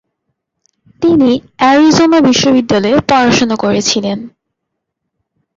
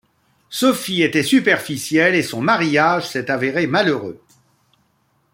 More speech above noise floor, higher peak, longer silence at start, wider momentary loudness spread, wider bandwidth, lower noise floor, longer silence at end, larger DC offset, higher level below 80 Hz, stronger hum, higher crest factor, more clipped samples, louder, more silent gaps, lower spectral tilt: first, 65 dB vs 46 dB; about the same, 0 dBFS vs -2 dBFS; first, 1 s vs 0.5 s; about the same, 7 LU vs 6 LU; second, 7.8 kHz vs 16.5 kHz; first, -74 dBFS vs -63 dBFS; first, 1.3 s vs 1.15 s; neither; first, -46 dBFS vs -62 dBFS; neither; second, 10 dB vs 18 dB; neither; first, -10 LUFS vs -17 LUFS; neither; about the same, -4 dB/octave vs -4.5 dB/octave